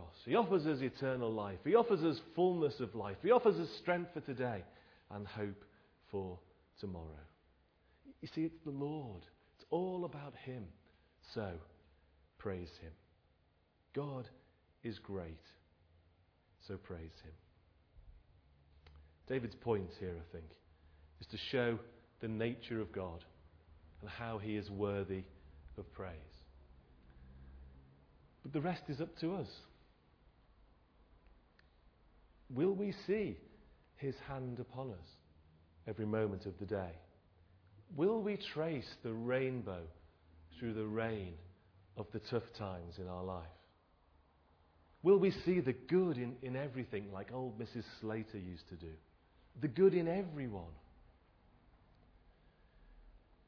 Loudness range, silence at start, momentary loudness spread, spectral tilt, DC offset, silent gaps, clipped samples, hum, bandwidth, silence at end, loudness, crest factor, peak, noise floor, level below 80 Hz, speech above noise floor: 13 LU; 0 s; 21 LU; -6 dB/octave; under 0.1%; none; under 0.1%; none; 5.4 kHz; 0.3 s; -40 LUFS; 24 dB; -18 dBFS; -74 dBFS; -64 dBFS; 36 dB